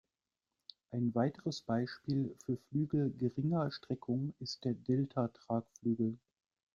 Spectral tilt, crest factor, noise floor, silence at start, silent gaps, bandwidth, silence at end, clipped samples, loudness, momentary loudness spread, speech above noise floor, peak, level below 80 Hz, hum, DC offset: -7.5 dB/octave; 18 dB; under -90 dBFS; 0.9 s; none; 7.4 kHz; 0.6 s; under 0.1%; -37 LUFS; 8 LU; over 54 dB; -18 dBFS; -72 dBFS; none; under 0.1%